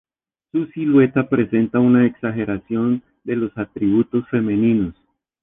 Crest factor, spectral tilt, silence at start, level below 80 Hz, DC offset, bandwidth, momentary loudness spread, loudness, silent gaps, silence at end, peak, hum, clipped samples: 16 dB; -11.5 dB/octave; 0.55 s; -52 dBFS; under 0.1%; 3.7 kHz; 10 LU; -19 LUFS; none; 0.5 s; -4 dBFS; none; under 0.1%